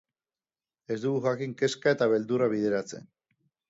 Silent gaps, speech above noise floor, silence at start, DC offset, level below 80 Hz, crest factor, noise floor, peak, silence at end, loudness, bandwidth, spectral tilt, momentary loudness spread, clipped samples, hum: none; over 63 dB; 0.9 s; under 0.1%; -74 dBFS; 18 dB; under -90 dBFS; -12 dBFS; 0.65 s; -28 LUFS; 8 kHz; -5.5 dB/octave; 10 LU; under 0.1%; none